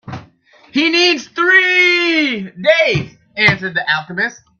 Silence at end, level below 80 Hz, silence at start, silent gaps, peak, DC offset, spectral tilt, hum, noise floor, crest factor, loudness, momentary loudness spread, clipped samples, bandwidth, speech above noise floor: 0.25 s; -54 dBFS; 0.05 s; none; 0 dBFS; under 0.1%; -4 dB/octave; none; -48 dBFS; 16 dB; -13 LUFS; 11 LU; under 0.1%; 7.2 kHz; 33 dB